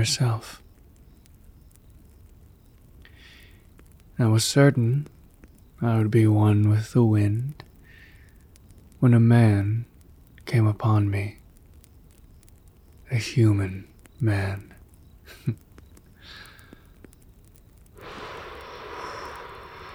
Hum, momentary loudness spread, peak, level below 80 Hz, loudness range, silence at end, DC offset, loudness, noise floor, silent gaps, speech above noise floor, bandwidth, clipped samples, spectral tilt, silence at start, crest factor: none; 23 LU; -6 dBFS; -54 dBFS; 18 LU; 0 s; under 0.1%; -23 LUFS; -52 dBFS; none; 31 dB; 14.5 kHz; under 0.1%; -6.5 dB/octave; 0 s; 20 dB